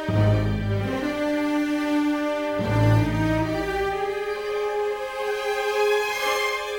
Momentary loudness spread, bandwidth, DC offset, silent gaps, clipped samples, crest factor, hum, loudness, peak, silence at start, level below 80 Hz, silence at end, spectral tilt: 6 LU; 19.5 kHz; under 0.1%; none; under 0.1%; 14 dB; none; -24 LUFS; -8 dBFS; 0 s; -40 dBFS; 0 s; -6 dB/octave